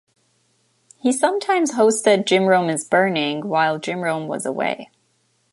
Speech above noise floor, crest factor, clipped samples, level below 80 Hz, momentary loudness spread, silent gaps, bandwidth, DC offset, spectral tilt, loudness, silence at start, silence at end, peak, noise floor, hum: 46 dB; 18 dB; under 0.1%; -72 dBFS; 8 LU; none; 11.5 kHz; under 0.1%; -4 dB/octave; -19 LUFS; 1.05 s; 0.7 s; -2 dBFS; -65 dBFS; none